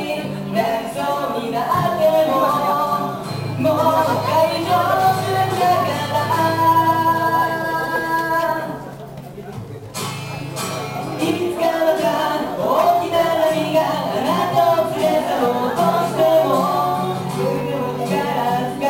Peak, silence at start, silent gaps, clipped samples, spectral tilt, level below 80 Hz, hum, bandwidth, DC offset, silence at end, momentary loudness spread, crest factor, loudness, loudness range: -4 dBFS; 0 s; none; under 0.1%; -5.5 dB/octave; -52 dBFS; none; 16.5 kHz; under 0.1%; 0 s; 10 LU; 14 dB; -18 LUFS; 6 LU